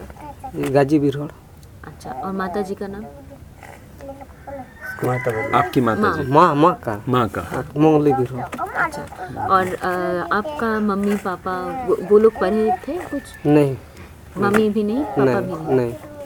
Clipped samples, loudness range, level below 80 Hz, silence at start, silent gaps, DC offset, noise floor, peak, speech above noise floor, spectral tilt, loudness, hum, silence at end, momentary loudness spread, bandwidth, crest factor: under 0.1%; 10 LU; -46 dBFS; 0 s; none; under 0.1%; -40 dBFS; 0 dBFS; 21 dB; -7 dB/octave; -19 LUFS; none; 0 s; 20 LU; 19.5 kHz; 20 dB